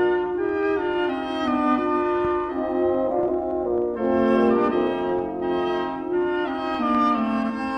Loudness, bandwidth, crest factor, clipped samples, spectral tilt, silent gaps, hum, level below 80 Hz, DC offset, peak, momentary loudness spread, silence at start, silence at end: -23 LUFS; 6 kHz; 16 dB; under 0.1%; -7 dB/octave; none; none; -50 dBFS; under 0.1%; -8 dBFS; 5 LU; 0 s; 0 s